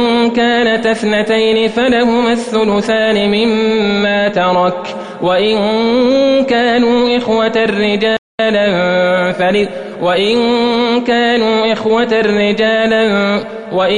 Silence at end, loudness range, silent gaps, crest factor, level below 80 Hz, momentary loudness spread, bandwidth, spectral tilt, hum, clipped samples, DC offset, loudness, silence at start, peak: 0 s; 1 LU; 8.18-8.38 s; 10 dB; -46 dBFS; 4 LU; 10.5 kHz; -5.5 dB/octave; none; under 0.1%; under 0.1%; -12 LUFS; 0 s; -2 dBFS